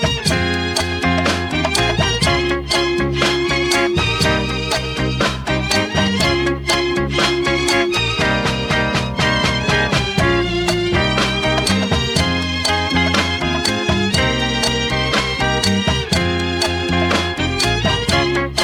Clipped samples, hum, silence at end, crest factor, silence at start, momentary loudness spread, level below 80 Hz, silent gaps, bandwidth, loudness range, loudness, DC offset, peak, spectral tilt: under 0.1%; none; 0 s; 14 dB; 0 s; 3 LU; -32 dBFS; none; 18 kHz; 1 LU; -16 LUFS; under 0.1%; -2 dBFS; -4 dB/octave